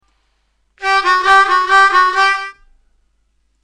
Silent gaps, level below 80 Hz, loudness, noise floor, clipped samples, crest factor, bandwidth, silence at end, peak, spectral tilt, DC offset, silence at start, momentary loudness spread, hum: none; -48 dBFS; -11 LUFS; -62 dBFS; under 0.1%; 14 dB; 11 kHz; 1.15 s; 0 dBFS; 0 dB/octave; under 0.1%; 0.8 s; 11 LU; none